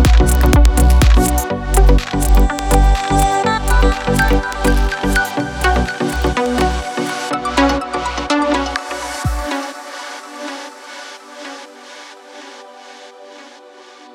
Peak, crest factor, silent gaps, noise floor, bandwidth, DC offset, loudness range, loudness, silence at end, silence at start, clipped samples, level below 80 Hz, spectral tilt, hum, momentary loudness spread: 0 dBFS; 14 dB; none; -40 dBFS; 18 kHz; under 0.1%; 17 LU; -16 LUFS; 0.65 s; 0 s; under 0.1%; -18 dBFS; -5 dB/octave; none; 23 LU